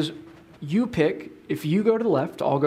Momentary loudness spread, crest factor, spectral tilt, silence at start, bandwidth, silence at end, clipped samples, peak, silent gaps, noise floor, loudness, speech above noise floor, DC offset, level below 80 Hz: 14 LU; 18 dB; -7.5 dB/octave; 0 s; 15.5 kHz; 0 s; under 0.1%; -6 dBFS; none; -44 dBFS; -24 LUFS; 21 dB; under 0.1%; -60 dBFS